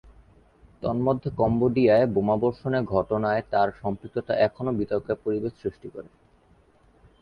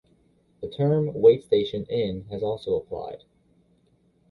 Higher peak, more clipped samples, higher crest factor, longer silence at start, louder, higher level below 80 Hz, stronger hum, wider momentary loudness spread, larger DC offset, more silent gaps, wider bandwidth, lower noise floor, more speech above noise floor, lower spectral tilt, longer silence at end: about the same, -8 dBFS vs -6 dBFS; neither; about the same, 18 dB vs 20 dB; first, 0.8 s vs 0.6 s; about the same, -25 LUFS vs -24 LUFS; about the same, -52 dBFS vs -56 dBFS; neither; second, 12 LU vs 19 LU; neither; neither; first, 5.4 kHz vs 4.9 kHz; second, -59 dBFS vs -64 dBFS; second, 35 dB vs 40 dB; about the same, -9.5 dB/octave vs -9 dB/octave; about the same, 1.2 s vs 1.15 s